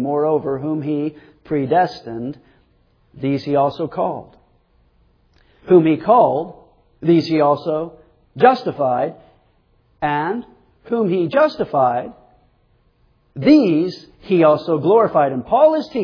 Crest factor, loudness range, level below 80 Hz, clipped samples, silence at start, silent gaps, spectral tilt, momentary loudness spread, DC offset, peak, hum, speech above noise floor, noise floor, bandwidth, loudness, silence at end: 18 dB; 6 LU; -56 dBFS; under 0.1%; 0 s; none; -8.5 dB/octave; 12 LU; under 0.1%; 0 dBFS; none; 42 dB; -59 dBFS; 5.4 kHz; -17 LUFS; 0 s